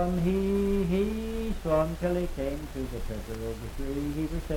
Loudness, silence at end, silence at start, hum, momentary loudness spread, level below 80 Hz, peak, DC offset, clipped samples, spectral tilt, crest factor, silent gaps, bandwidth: -30 LUFS; 0 s; 0 s; none; 9 LU; -36 dBFS; -14 dBFS; under 0.1%; under 0.1%; -7.5 dB/octave; 16 dB; none; 17.5 kHz